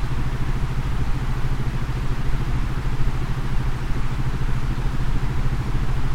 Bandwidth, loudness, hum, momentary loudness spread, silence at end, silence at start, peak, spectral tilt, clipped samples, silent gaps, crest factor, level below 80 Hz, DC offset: 9.6 kHz; -27 LUFS; none; 1 LU; 0 s; 0 s; -8 dBFS; -6.5 dB/octave; under 0.1%; none; 12 dB; -24 dBFS; under 0.1%